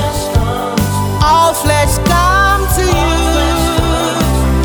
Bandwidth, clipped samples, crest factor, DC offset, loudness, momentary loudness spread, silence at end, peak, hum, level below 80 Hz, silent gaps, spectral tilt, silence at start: over 20 kHz; under 0.1%; 12 dB; under 0.1%; -12 LUFS; 5 LU; 0 s; 0 dBFS; none; -18 dBFS; none; -4.5 dB/octave; 0 s